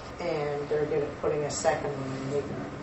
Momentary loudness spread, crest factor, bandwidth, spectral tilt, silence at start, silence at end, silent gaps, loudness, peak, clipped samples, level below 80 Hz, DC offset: 6 LU; 20 dB; 8.4 kHz; -5 dB/octave; 0 s; 0 s; none; -30 LUFS; -12 dBFS; under 0.1%; -54 dBFS; under 0.1%